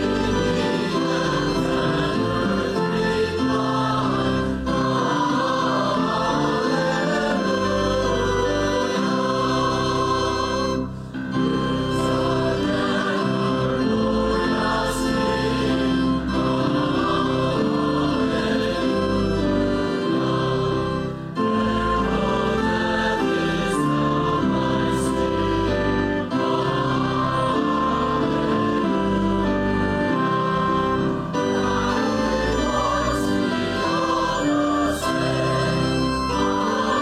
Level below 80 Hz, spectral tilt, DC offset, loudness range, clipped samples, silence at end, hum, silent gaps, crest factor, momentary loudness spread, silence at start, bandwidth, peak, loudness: -38 dBFS; -6 dB/octave; under 0.1%; 1 LU; under 0.1%; 0 s; none; none; 10 dB; 1 LU; 0 s; 14 kHz; -12 dBFS; -22 LUFS